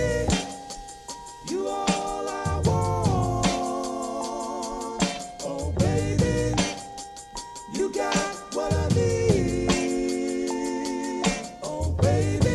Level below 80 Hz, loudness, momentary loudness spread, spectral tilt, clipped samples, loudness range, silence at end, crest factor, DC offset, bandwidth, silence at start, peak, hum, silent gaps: -38 dBFS; -26 LUFS; 14 LU; -5 dB/octave; under 0.1%; 2 LU; 0 s; 18 dB; under 0.1%; 13 kHz; 0 s; -6 dBFS; none; none